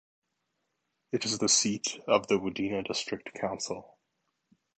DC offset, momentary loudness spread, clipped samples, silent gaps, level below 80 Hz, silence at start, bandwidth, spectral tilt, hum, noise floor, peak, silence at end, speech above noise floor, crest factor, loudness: under 0.1%; 12 LU; under 0.1%; none; -68 dBFS; 1.15 s; 9.2 kHz; -2.5 dB/octave; none; -81 dBFS; -8 dBFS; 0.95 s; 50 dB; 24 dB; -29 LUFS